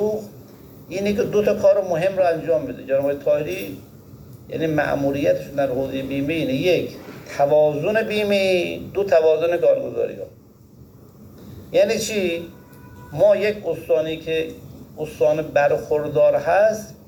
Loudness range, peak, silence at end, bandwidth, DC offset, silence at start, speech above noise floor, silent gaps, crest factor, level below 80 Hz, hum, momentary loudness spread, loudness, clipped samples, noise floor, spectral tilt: 4 LU; -6 dBFS; 0.15 s; 19.5 kHz; under 0.1%; 0 s; 27 dB; none; 16 dB; -54 dBFS; none; 15 LU; -20 LUFS; under 0.1%; -47 dBFS; -5.5 dB/octave